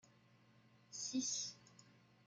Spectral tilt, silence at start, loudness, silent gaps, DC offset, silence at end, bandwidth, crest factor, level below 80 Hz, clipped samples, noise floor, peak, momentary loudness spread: -1.5 dB/octave; 0.35 s; -43 LUFS; none; under 0.1%; 0.25 s; 10.5 kHz; 18 dB; under -90 dBFS; under 0.1%; -70 dBFS; -30 dBFS; 22 LU